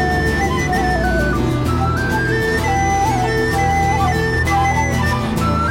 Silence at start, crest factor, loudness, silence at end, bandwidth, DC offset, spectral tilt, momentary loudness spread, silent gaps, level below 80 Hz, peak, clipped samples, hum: 0 s; 10 dB; -17 LUFS; 0 s; 16.5 kHz; under 0.1%; -5.5 dB/octave; 2 LU; none; -26 dBFS; -6 dBFS; under 0.1%; none